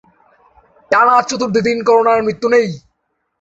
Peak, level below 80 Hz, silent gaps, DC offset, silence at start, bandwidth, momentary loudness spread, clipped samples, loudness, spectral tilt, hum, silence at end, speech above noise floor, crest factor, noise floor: -2 dBFS; -54 dBFS; none; under 0.1%; 0.9 s; 8 kHz; 6 LU; under 0.1%; -13 LUFS; -4.5 dB/octave; none; 0.65 s; 56 dB; 14 dB; -69 dBFS